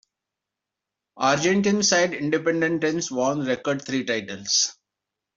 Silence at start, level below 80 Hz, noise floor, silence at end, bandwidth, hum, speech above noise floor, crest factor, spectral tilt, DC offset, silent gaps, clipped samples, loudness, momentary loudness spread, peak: 1.15 s; -64 dBFS; -86 dBFS; 0.65 s; 7.8 kHz; none; 63 dB; 18 dB; -3 dB/octave; under 0.1%; none; under 0.1%; -23 LUFS; 7 LU; -6 dBFS